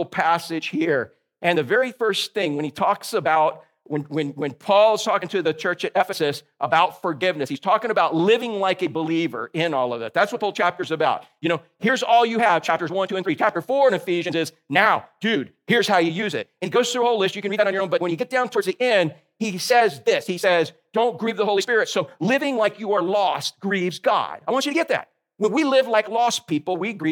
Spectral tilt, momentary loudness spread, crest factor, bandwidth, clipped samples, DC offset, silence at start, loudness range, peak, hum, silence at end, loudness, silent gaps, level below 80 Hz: -4.5 dB/octave; 7 LU; 20 dB; 18 kHz; under 0.1%; under 0.1%; 0 s; 2 LU; -2 dBFS; none; 0 s; -21 LUFS; none; -78 dBFS